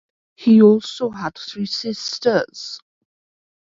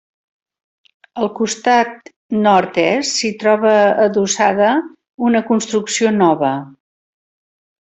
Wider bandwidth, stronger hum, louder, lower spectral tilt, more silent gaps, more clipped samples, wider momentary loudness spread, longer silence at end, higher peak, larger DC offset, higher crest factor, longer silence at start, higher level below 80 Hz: second, 7.6 kHz vs 8.4 kHz; neither; second, -18 LUFS vs -15 LUFS; first, -5.5 dB/octave vs -4 dB/octave; second, none vs 2.16-2.29 s, 5.09-5.18 s; neither; first, 18 LU vs 10 LU; about the same, 1 s vs 1.1 s; about the same, 0 dBFS vs -2 dBFS; neither; about the same, 18 dB vs 16 dB; second, 0.4 s vs 1.15 s; about the same, -64 dBFS vs -60 dBFS